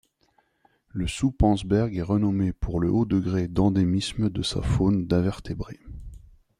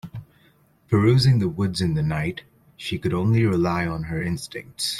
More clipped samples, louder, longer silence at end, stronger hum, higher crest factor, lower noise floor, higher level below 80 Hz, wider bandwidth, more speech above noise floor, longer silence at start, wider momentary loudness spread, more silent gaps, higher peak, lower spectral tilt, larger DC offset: neither; second, -25 LUFS vs -22 LUFS; first, 0.45 s vs 0 s; neither; about the same, 16 dB vs 18 dB; first, -67 dBFS vs -58 dBFS; first, -38 dBFS vs -48 dBFS; second, 11.5 kHz vs 14 kHz; first, 43 dB vs 37 dB; first, 0.95 s vs 0.05 s; second, 13 LU vs 16 LU; neither; about the same, -8 dBFS vs -6 dBFS; about the same, -7 dB/octave vs -6 dB/octave; neither